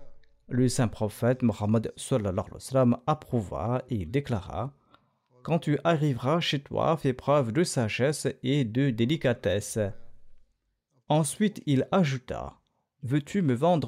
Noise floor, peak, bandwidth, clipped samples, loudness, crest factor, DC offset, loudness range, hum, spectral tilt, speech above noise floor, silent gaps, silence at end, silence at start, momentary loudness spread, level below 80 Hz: -74 dBFS; -12 dBFS; 16 kHz; under 0.1%; -28 LUFS; 14 dB; under 0.1%; 3 LU; none; -6 dB/octave; 48 dB; none; 0 s; 0 s; 8 LU; -56 dBFS